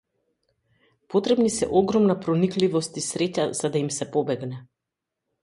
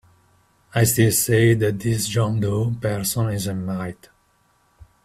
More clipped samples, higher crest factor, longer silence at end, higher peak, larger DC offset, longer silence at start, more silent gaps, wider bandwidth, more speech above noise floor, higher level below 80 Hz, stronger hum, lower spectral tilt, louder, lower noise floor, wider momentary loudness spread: neither; about the same, 18 dB vs 18 dB; second, 0.8 s vs 1.1 s; about the same, -6 dBFS vs -4 dBFS; neither; first, 1.1 s vs 0.75 s; neither; second, 11.5 kHz vs 16 kHz; first, 62 dB vs 42 dB; second, -60 dBFS vs -50 dBFS; neither; about the same, -5.5 dB/octave vs -5 dB/octave; second, -24 LUFS vs -21 LUFS; first, -85 dBFS vs -62 dBFS; second, 8 LU vs 11 LU